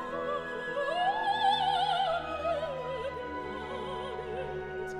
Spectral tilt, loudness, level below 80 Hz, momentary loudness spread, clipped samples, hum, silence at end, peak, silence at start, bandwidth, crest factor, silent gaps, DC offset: -4.5 dB/octave; -32 LUFS; -56 dBFS; 10 LU; under 0.1%; none; 0 s; -16 dBFS; 0 s; 11.5 kHz; 16 dB; none; under 0.1%